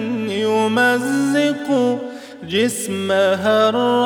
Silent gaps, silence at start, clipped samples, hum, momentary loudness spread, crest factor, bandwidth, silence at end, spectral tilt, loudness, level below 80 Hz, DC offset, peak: none; 0 s; under 0.1%; none; 7 LU; 14 dB; 19.5 kHz; 0 s; -4 dB/octave; -18 LUFS; -64 dBFS; under 0.1%; -4 dBFS